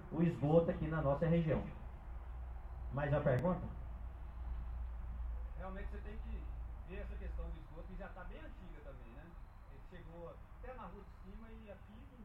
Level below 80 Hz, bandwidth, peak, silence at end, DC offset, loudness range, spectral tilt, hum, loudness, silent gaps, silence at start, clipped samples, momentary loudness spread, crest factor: -48 dBFS; 4.9 kHz; -18 dBFS; 0 s; under 0.1%; 17 LU; -10 dB/octave; none; -41 LUFS; none; 0 s; under 0.1%; 21 LU; 22 dB